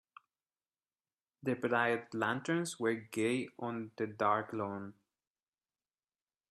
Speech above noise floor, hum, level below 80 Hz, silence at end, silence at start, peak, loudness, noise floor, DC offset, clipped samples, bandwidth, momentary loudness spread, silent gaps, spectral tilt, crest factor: over 55 dB; none; -80 dBFS; 1.6 s; 1.45 s; -16 dBFS; -36 LUFS; under -90 dBFS; under 0.1%; under 0.1%; 13 kHz; 9 LU; none; -5 dB/octave; 22 dB